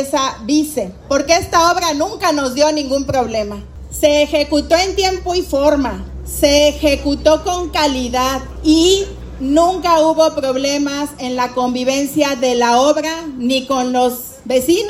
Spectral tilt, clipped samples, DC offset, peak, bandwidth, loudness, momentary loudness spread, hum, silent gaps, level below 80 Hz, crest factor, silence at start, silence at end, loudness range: -3.5 dB/octave; under 0.1%; under 0.1%; 0 dBFS; 16 kHz; -15 LUFS; 9 LU; none; none; -34 dBFS; 14 dB; 0 s; 0 s; 2 LU